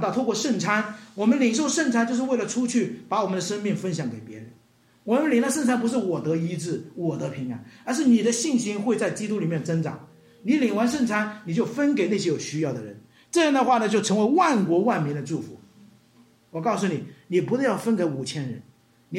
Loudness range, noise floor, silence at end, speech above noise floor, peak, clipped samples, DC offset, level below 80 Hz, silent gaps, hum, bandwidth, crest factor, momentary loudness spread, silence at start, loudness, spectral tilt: 4 LU; -59 dBFS; 0 s; 35 dB; -8 dBFS; under 0.1%; under 0.1%; -72 dBFS; none; none; 15 kHz; 18 dB; 13 LU; 0 s; -24 LUFS; -5 dB/octave